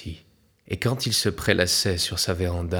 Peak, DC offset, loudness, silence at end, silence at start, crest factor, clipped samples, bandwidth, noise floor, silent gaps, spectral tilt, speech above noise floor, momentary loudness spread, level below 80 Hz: -2 dBFS; under 0.1%; -23 LUFS; 0 s; 0 s; 22 dB; under 0.1%; 19.5 kHz; -58 dBFS; none; -3.5 dB/octave; 34 dB; 8 LU; -44 dBFS